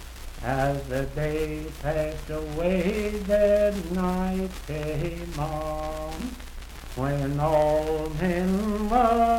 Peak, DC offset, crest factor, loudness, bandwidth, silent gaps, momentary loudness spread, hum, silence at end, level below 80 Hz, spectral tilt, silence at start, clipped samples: -8 dBFS; under 0.1%; 16 dB; -26 LUFS; 17 kHz; none; 12 LU; none; 0 s; -36 dBFS; -6.5 dB/octave; 0 s; under 0.1%